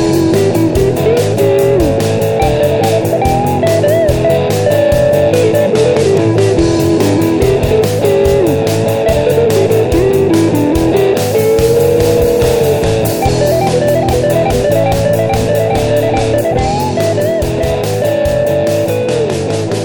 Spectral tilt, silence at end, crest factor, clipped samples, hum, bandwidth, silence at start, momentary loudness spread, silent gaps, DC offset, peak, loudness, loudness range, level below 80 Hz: -6 dB/octave; 0 s; 10 dB; under 0.1%; none; over 20 kHz; 0 s; 3 LU; none; 1%; 0 dBFS; -11 LUFS; 2 LU; -28 dBFS